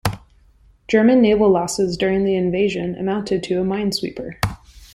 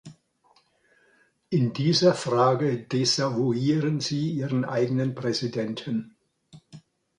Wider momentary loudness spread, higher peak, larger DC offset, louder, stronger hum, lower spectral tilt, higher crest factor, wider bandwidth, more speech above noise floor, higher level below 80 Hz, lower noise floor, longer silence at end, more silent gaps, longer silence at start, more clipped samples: first, 12 LU vs 8 LU; first, -2 dBFS vs -8 dBFS; neither; first, -19 LUFS vs -25 LUFS; neither; about the same, -5.5 dB/octave vs -5.5 dB/octave; about the same, 18 dB vs 18 dB; first, 16 kHz vs 11 kHz; second, 35 dB vs 40 dB; first, -44 dBFS vs -66 dBFS; second, -52 dBFS vs -64 dBFS; second, 0.1 s vs 0.4 s; neither; about the same, 0.05 s vs 0.05 s; neither